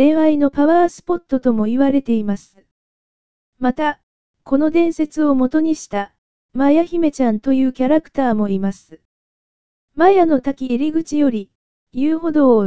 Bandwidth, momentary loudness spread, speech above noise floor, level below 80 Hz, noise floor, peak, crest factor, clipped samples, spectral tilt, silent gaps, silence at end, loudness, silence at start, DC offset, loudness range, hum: 8 kHz; 11 LU; over 74 dB; -50 dBFS; under -90 dBFS; 0 dBFS; 16 dB; under 0.1%; -7 dB/octave; 2.71-3.53 s, 4.03-4.34 s, 6.18-6.49 s, 9.05-9.88 s, 11.55-11.87 s; 0 s; -17 LUFS; 0 s; 3%; 3 LU; none